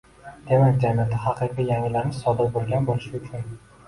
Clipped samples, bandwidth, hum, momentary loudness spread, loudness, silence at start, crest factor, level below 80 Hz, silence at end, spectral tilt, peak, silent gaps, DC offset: under 0.1%; 11.5 kHz; none; 15 LU; -23 LUFS; 0.25 s; 16 dB; -48 dBFS; 0.3 s; -8.5 dB/octave; -6 dBFS; none; under 0.1%